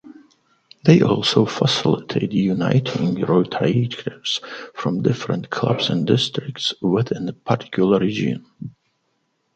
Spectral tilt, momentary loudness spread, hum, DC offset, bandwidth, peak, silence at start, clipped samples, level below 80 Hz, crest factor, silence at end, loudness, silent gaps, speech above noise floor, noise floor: -6 dB/octave; 9 LU; none; under 0.1%; 9 kHz; 0 dBFS; 0.05 s; under 0.1%; -56 dBFS; 20 dB; 0.85 s; -20 LUFS; none; 50 dB; -69 dBFS